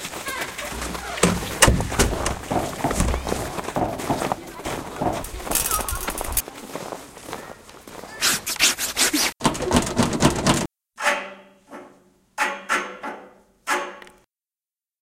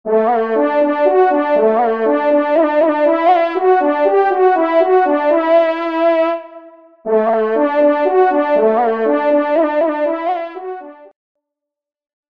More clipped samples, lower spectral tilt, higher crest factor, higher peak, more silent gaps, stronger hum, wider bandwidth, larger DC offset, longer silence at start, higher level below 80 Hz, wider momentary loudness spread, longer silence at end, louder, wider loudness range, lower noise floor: neither; second, -3 dB/octave vs -7 dB/octave; first, 24 dB vs 12 dB; about the same, 0 dBFS vs -2 dBFS; neither; neither; first, 17 kHz vs 5.4 kHz; second, under 0.1% vs 0.3%; about the same, 0 s vs 0.05 s; first, -36 dBFS vs -68 dBFS; first, 18 LU vs 6 LU; second, 0.9 s vs 1.3 s; second, -23 LUFS vs -14 LUFS; first, 7 LU vs 3 LU; first, under -90 dBFS vs -81 dBFS